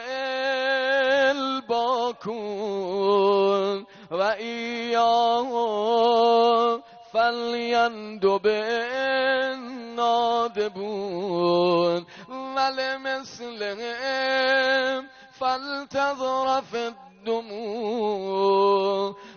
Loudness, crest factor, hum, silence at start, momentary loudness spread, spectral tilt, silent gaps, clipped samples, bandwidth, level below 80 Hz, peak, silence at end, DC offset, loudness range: -24 LUFS; 14 dB; none; 0 s; 11 LU; -1.5 dB/octave; none; under 0.1%; 6.8 kHz; -68 dBFS; -10 dBFS; 0 s; under 0.1%; 4 LU